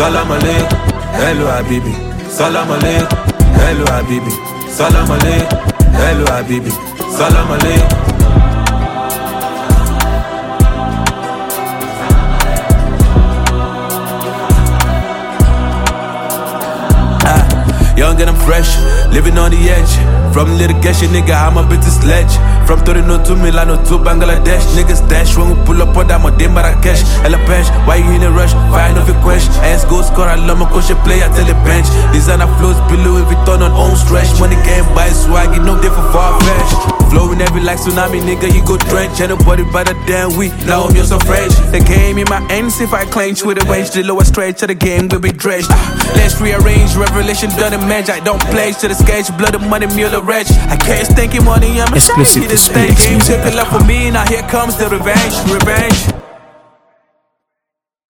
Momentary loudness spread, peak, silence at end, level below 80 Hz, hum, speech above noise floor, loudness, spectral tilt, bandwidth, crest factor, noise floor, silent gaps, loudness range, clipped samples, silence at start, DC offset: 6 LU; 0 dBFS; 1.85 s; -12 dBFS; none; 71 dB; -11 LUFS; -5 dB/octave; 19.5 kHz; 8 dB; -79 dBFS; none; 4 LU; 0.2%; 0 s; under 0.1%